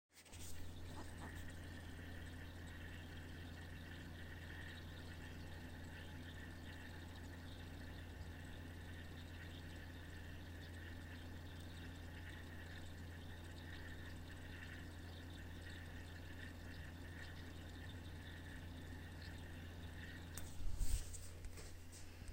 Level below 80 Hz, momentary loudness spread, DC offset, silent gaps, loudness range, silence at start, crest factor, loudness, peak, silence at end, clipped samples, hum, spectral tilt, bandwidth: -56 dBFS; 2 LU; under 0.1%; none; 2 LU; 0.1 s; 24 dB; -53 LUFS; -26 dBFS; 0 s; under 0.1%; none; -4.5 dB/octave; 16.5 kHz